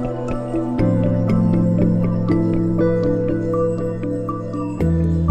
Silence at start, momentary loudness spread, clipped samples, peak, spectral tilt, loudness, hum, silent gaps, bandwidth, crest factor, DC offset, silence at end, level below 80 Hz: 0 s; 7 LU; under 0.1%; -4 dBFS; -10 dB/octave; -19 LUFS; none; none; 8.4 kHz; 14 dB; under 0.1%; 0 s; -32 dBFS